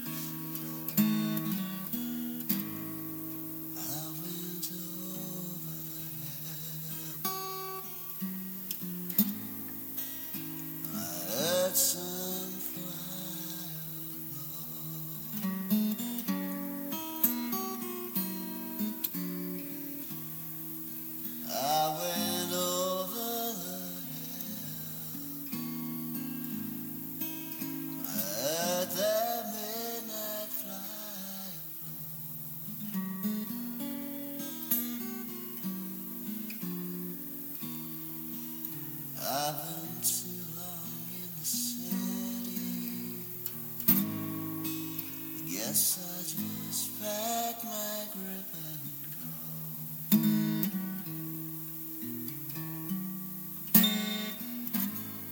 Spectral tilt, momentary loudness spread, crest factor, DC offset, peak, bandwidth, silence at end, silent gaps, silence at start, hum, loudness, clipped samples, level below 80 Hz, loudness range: -4 dB/octave; 9 LU; 28 dB; under 0.1%; -6 dBFS; over 20 kHz; 0 s; none; 0 s; none; -33 LUFS; under 0.1%; -78 dBFS; 6 LU